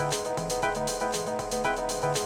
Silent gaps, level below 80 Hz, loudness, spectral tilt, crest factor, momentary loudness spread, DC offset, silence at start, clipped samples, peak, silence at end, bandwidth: none; -48 dBFS; -29 LUFS; -3 dB/octave; 16 dB; 2 LU; under 0.1%; 0 s; under 0.1%; -12 dBFS; 0 s; 19.5 kHz